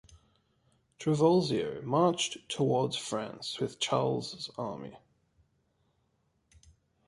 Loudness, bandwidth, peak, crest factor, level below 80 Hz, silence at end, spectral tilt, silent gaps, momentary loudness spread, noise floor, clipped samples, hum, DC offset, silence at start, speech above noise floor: -31 LUFS; 11.5 kHz; -12 dBFS; 20 dB; -68 dBFS; 2.1 s; -5 dB/octave; none; 13 LU; -75 dBFS; under 0.1%; none; under 0.1%; 0.1 s; 44 dB